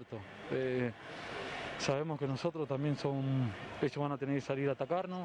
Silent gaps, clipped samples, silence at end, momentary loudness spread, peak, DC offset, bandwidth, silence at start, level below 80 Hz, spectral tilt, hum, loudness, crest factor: none; under 0.1%; 0 s; 7 LU; -16 dBFS; under 0.1%; 10 kHz; 0 s; -68 dBFS; -6.5 dB/octave; none; -37 LUFS; 20 dB